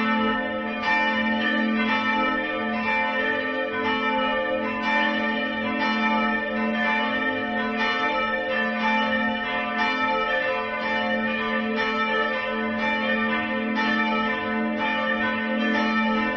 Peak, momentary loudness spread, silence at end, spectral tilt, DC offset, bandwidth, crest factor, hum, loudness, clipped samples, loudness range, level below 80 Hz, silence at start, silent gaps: -10 dBFS; 3 LU; 0 s; -5.5 dB/octave; under 0.1%; 6.4 kHz; 14 dB; none; -23 LUFS; under 0.1%; 1 LU; -54 dBFS; 0 s; none